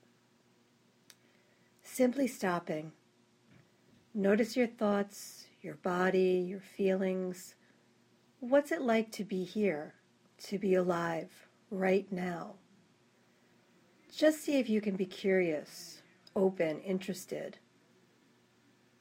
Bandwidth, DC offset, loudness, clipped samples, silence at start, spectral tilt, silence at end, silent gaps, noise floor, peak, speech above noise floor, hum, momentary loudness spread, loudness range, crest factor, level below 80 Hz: 16 kHz; under 0.1%; -33 LUFS; under 0.1%; 1.85 s; -6 dB/octave; 1.5 s; none; -69 dBFS; -14 dBFS; 36 dB; none; 18 LU; 5 LU; 20 dB; -80 dBFS